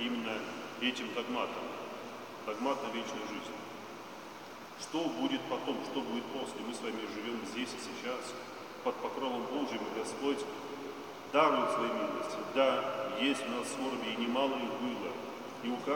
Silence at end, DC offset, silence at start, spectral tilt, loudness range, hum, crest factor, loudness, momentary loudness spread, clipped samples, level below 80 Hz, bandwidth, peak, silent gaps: 0 s; under 0.1%; 0 s; -3.5 dB/octave; 7 LU; none; 24 dB; -36 LUFS; 13 LU; under 0.1%; -82 dBFS; 17 kHz; -12 dBFS; none